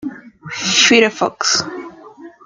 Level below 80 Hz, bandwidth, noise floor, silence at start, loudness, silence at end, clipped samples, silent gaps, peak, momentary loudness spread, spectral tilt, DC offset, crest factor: -60 dBFS; 10.5 kHz; -39 dBFS; 0 s; -13 LUFS; 0.15 s; under 0.1%; none; 0 dBFS; 20 LU; -1.5 dB/octave; under 0.1%; 18 dB